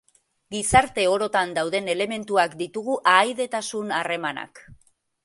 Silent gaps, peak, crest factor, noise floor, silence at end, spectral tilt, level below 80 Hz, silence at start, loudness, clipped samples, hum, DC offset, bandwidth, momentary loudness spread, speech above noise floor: none; -2 dBFS; 22 dB; -60 dBFS; 0.5 s; -3 dB/octave; -50 dBFS; 0.5 s; -23 LUFS; under 0.1%; none; under 0.1%; 11.5 kHz; 11 LU; 37 dB